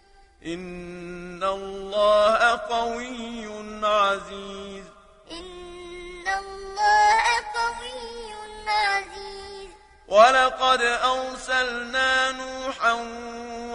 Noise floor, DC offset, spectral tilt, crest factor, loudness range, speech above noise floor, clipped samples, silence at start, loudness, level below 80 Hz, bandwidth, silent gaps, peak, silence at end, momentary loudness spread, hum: -48 dBFS; under 0.1%; -2 dB/octave; 22 dB; 7 LU; 25 dB; under 0.1%; 0.45 s; -22 LUFS; -50 dBFS; 10.5 kHz; none; -2 dBFS; 0 s; 20 LU; none